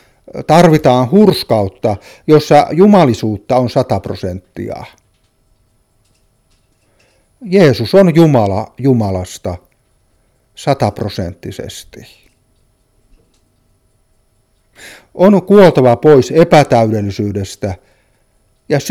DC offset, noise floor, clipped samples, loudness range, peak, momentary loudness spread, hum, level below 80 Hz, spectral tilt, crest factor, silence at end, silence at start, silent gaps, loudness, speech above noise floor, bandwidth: under 0.1%; -57 dBFS; 0.3%; 13 LU; 0 dBFS; 18 LU; none; -44 dBFS; -7 dB/octave; 12 dB; 0 s; 0.35 s; none; -11 LUFS; 46 dB; 16 kHz